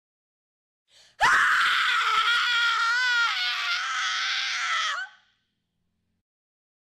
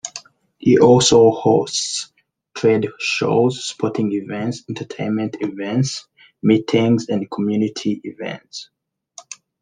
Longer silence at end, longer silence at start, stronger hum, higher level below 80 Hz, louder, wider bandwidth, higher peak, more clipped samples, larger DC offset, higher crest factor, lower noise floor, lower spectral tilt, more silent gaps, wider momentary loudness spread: first, 1.75 s vs 0.3 s; first, 1.2 s vs 0.05 s; neither; second, -64 dBFS vs -58 dBFS; second, -22 LUFS vs -18 LUFS; first, 14.5 kHz vs 10 kHz; second, -10 dBFS vs -2 dBFS; neither; neither; about the same, 16 dB vs 18 dB; first, -77 dBFS vs -45 dBFS; second, 2 dB/octave vs -5 dB/octave; neither; second, 6 LU vs 19 LU